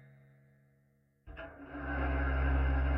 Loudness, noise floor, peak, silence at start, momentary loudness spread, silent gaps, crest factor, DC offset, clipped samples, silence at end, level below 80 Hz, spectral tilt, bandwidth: -34 LUFS; -71 dBFS; -22 dBFS; 1.25 s; 17 LU; none; 14 dB; under 0.1%; under 0.1%; 0 s; -36 dBFS; -10 dB/octave; 3.2 kHz